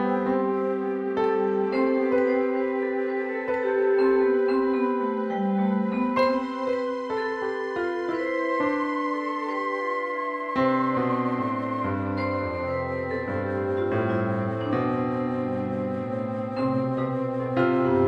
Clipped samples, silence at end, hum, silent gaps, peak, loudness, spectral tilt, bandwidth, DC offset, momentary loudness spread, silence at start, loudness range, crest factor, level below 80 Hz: under 0.1%; 0 s; none; none; -10 dBFS; -26 LUFS; -8.5 dB/octave; 7.8 kHz; under 0.1%; 6 LU; 0 s; 3 LU; 16 dB; -60 dBFS